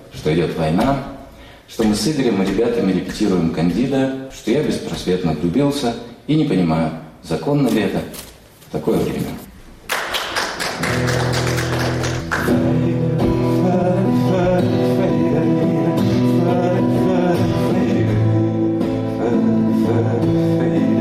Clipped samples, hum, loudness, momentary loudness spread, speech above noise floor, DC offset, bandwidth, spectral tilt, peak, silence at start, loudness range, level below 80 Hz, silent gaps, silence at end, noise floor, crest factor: under 0.1%; none; -18 LUFS; 7 LU; 21 dB; under 0.1%; 15.5 kHz; -6.5 dB/octave; -6 dBFS; 0 s; 5 LU; -40 dBFS; none; 0 s; -39 dBFS; 10 dB